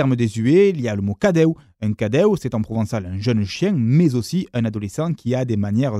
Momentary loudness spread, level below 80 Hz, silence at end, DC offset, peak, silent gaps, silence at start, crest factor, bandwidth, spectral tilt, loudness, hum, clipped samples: 8 LU; -52 dBFS; 0 s; under 0.1%; -2 dBFS; none; 0 s; 16 dB; 13.5 kHz; -7.5 dB/octave; -20 LUFS; none; under 0.1%